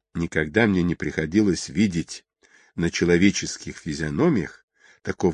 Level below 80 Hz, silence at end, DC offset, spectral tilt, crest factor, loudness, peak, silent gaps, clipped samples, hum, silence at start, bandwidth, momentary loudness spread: -44 dBFS; 0 s; under 0.1%; -5.5 dB/octave; 20 dB; -23 LUFS; -4 dBFS; 4.63-4.68 s; under 0.1%; none; 0.15 s; 10.5 kHz; 15 LU